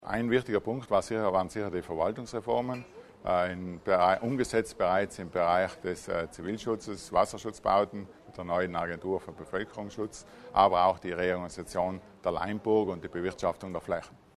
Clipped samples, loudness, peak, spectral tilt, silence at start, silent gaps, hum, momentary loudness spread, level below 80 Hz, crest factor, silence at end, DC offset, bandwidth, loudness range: under 0.1%; -31 LUFS; -8 dBFS; -5.5 dB/octave; 0 s; none; none; 11 LU; -58 dBFS; 22 dB; 0.25 s; under 0.1%; 13 kHz; 3 LU